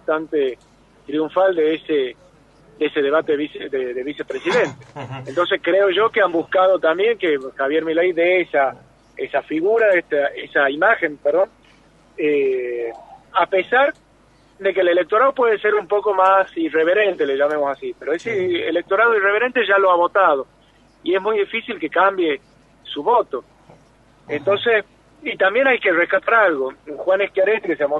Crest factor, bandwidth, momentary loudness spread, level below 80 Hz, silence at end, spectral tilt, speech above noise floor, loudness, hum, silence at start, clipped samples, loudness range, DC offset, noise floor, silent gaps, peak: 16 dB; 8.2 kHz; 11 LU; -60 dBFS; 0 s; -5.5 dB/octave; 35 dB; -18 LUFS; none; 0.1 s; under 0.1%; 4 LU; under 0.1%; -53 dBFS; none; -2 dBFS